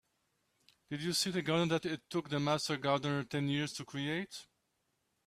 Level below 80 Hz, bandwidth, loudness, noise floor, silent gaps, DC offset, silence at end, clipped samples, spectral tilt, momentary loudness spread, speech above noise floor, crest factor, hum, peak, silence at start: -72 dBFS; 15 kHz; -35 LUFS; -81 dBFS; none; under 0.1%; 0.85 s; under 0.1%; -4.5 dB/octave; 7 LU; 46 dB; 18 dB; none; -18 dBFS; 0.9 s